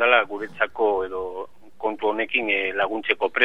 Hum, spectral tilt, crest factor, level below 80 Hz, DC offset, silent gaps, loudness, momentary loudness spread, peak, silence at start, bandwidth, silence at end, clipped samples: none; -5 dB/octave; 22 dB; -62 dBFS; 0.8%; none; -24 LUFS; 10 LU; 0 dBFS; 0 s; 5.8 kHz; 0 s; under 0.1%